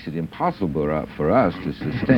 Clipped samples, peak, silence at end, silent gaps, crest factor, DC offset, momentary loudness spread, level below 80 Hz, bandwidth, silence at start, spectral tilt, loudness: under 0.1%; -4 dBFS; 0 s; none; 18 dB; under 0.1%; 9 LU; -44 dBFS; 9.8 kHz; 0 s; -9 dB/octave; -23 LUFS